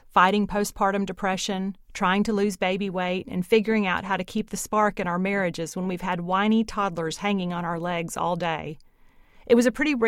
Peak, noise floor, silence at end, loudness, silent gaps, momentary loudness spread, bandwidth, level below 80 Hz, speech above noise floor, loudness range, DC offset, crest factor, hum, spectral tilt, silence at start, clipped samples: -4 dBFS; -54 dBFS; 0 s; -25 LUFS; none; 8 LU; 16 kHz; -50 dBFS; 30 dB; 2 LU; under 0.1%; 20 dB; none; -5 dB/octave; 0.15 s; under 0.1%